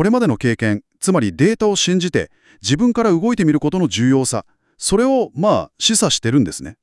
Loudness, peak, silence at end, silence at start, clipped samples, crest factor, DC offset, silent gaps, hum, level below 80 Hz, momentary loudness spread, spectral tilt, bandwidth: -17 LUFS; -2 dBFS; 0.1 s; 0 s; under 0.1%; 14 dB; under 0.1%; none; none; -46 dBFS; 6 LU; -4.5 dB/octave; 12 kHz